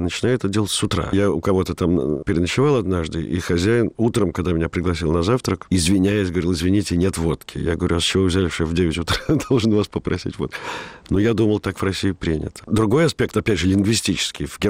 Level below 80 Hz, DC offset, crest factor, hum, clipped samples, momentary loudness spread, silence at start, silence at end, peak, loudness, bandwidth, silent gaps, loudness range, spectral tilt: -38 dBFS; 0.1%; 12 dB; none; under 0.1%; 7 LU; 0 s; 0 s; -8 dBFS; -20 LUFS; 16 kHz; none; 2 LU; -5.5 dB/octave